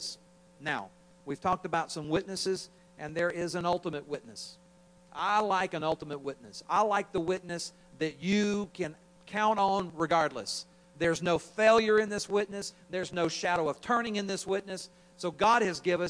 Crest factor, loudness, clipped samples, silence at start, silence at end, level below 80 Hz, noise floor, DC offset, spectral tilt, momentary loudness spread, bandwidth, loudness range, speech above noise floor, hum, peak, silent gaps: 20 dB; -31 LUFS; under 0.1%; 0 s; 0 s; -64 dBFS; -60 dBFS; under 0.1%; -4.5 dB/octave; 15 LU; 10.5 kHz; 5 LU; 29 dB; none; -10 dBFS; none